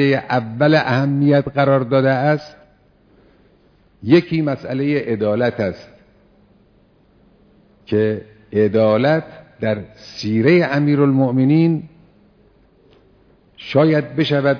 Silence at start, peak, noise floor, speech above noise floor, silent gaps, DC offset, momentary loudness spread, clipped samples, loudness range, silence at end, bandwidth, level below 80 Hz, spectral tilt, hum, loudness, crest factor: 0 s; 0 dBFS; -54 dBFS; 38 dB; none; under 0.1%; 10 LU; under 0.1%; 7 LU; 0 s; 5.4 kHz; -56 dBFS; -8.5 dB/octave; none; -17 LUFS; 18 dB